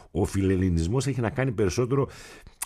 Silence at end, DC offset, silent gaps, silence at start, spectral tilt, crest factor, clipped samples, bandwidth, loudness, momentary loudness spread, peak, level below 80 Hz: 0 s; under 0.1%; none; 0.15 s; -6.5 dB/octave; 18 dB; under 0.1%; 14.5 kHz; -26 LUFS; 4 LU; -8 dBFS; -42 dBFS